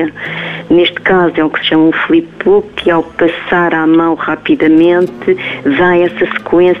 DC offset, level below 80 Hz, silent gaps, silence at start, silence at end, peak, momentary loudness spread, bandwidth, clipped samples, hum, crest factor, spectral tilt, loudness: under 0.1%; -44 dBFS; none; 0 s; 0 s; -2 dBFS; 5 LU; 4.1 kHz; under 0.1%; none; 10 dB; -7.5 dB/octave; -11 LUFS